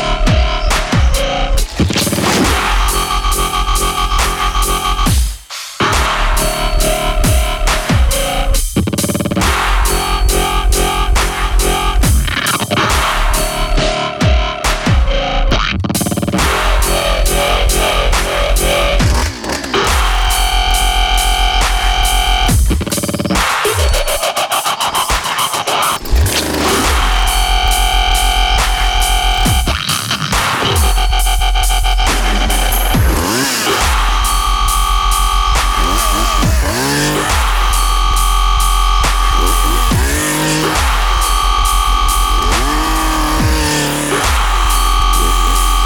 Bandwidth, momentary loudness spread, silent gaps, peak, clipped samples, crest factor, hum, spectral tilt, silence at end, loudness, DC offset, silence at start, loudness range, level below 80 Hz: 18.5 kHz; 3 LU; none; 0 dBFS; under 0.1%; 12 dB; none; -3 dB/octave; 0 s; -13 LUFS; under 0.1%; 0 s; 1 LU; -16 dBFS